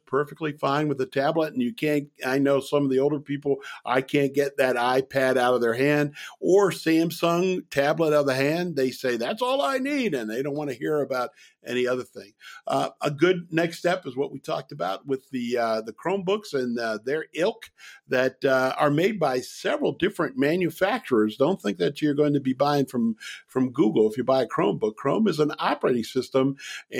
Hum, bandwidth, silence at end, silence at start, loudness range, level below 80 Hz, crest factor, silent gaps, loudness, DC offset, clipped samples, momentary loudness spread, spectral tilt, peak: none; 16.5 kHz; 0 s; 0.1 s; 5 LU; -68 dBFS; 18 dB; none; -25 LUFS; under 0.1%; under 0.1%; 8 LU; -6 dB/octave; -6 dBFS